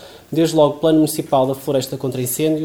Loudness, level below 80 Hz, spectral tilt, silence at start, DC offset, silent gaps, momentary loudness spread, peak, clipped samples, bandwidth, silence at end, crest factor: -18 LUFS; -58 dBFS; -5.5 dB/octave; 0 s; 0.1%; none; 8 LU; -2 dBFS; under 0.1%; 17.5 kHz; 0 s; 14 dB